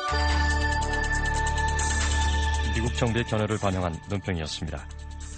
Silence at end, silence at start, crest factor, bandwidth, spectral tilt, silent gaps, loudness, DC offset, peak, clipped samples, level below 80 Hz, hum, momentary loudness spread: 0 s; 0 s; 16 dB; 9.4 kHz; -4.5 dB/octave; none; -26 LUFS; under 0.1%; -10 dBFS; under 0.1%; -30 dBFS; none; 8 LU